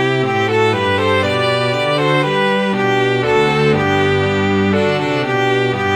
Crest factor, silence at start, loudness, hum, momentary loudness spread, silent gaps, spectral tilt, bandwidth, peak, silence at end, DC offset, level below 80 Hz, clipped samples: 12 dB; 0 s; -15 LUFS; none; 2 LU; none; -6 dB/octave; 12 kHz; -2 dBFS; 0 s; 0.1%; -48 dBFS; under 0.1%